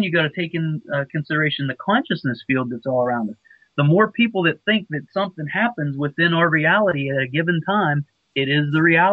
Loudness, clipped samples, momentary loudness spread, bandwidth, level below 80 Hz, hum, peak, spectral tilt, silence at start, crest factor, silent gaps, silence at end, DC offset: -20 LUFS; under 0.1%; 9 LU; 5.4 kHz; -62 dBFS; none; -4 dBFS; -9 dB/octave; 0 s; 16 dB; none; 0 s; under 0.1%